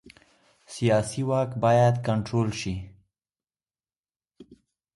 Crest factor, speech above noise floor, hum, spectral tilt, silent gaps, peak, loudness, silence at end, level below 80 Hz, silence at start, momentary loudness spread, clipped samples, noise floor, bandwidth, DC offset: 18 dB; over 66 dB; none; -6.5 dB/octave; 3.98-4.03 s; -10 dBFS; -25 LUFS; 0.4 s; -54 dBFS; 0.7 s; 12 LU; under 0.1%; under -90 dBFS; 11.5 kHz; under 0.1%